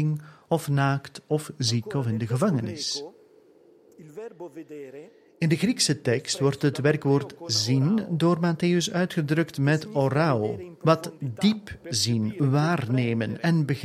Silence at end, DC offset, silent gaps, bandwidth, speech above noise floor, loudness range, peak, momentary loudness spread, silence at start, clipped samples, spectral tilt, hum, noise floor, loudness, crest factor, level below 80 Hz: 0 s; under 0.1%; none; 14.5 kHz; 31 dB; 6 LU; -6 dBFS; 12 LU; 0 s; under 0.1%; -5.5 dB/octave; none; -56 dBFS; -25 LUFS; 20 dB; -62 dBFS